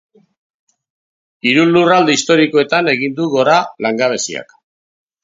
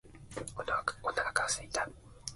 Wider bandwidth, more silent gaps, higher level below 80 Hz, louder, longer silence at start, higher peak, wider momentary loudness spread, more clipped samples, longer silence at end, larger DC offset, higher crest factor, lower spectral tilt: second, 7.8 kHz vs 12 kHz; neither; about the same, -62 dBFS vs -58 dBFS; first, -13 LUFS vs -35 LUFS; first, 1.45 s vs 0.05 s; first, 0 dBFS vs -14 dBFS; second, 9 LU vs 12 LU; neither; first, 0.8 s vs 0 s; neither; second, 16 dB vs 24 dB; first, -4 dB/octave vs -1.5 dB/octave